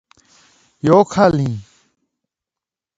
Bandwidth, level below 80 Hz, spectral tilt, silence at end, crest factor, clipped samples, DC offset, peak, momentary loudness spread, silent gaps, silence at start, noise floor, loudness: 8 kHz; -50 dBFS; -7 dB/octave; 1.35 s; 18 dB; under 0.1%; under 0.1%; 0 dBFS; 11 LU; none; 0.85 s; -87 dBFS; -15 LUFS